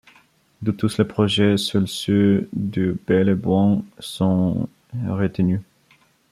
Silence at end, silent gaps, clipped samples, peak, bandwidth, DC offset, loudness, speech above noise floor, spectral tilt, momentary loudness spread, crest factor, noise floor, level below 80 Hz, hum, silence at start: 0.7 s; none; under 0.1%; -4 dBFS; 13.5 kHz; under 0.1%; -21 LUFS; 38 dB; -6.5 dB/octave; 9 LU; 16 dB; -58 dBFS; -54 dBFS; none; 0.6 s